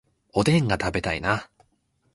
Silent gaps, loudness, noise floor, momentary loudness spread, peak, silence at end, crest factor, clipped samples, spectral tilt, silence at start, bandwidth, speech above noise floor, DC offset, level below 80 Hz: none; -24 LUFS; -69 dBFS; 7 LU; -6 dBFS; 0.7 s; 20 dB; under 0.1%; -6 dB/octave; 0.35 s; 11.5 kHz; 46 dB; under 0.1%; -44 dBFS